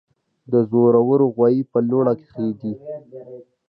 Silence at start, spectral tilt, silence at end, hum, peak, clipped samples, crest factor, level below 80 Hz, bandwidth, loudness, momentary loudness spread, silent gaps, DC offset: 0.5 s; -13 dB/octave; 0.3 s; none; -4 dBFS; under 0.1%; 16 dB; -66 dBFS; 4.8 kHz; -19 LUFS; 19 LU; none; under 0.1%